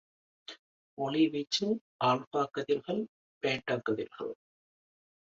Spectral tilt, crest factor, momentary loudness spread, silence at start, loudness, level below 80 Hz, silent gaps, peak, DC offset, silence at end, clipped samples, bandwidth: -5 dB/octave; 18 dB; 20 LU; 0.5 s; -32 LUFS; -74 dBFS; 0.59-0.97 s, 1.81-1.99 s, 2.27-2.31 s, 3.09-3.41 s; -16 dBFS; under 0.1%; 0.85 s; under 0.1%; 7.8 kHz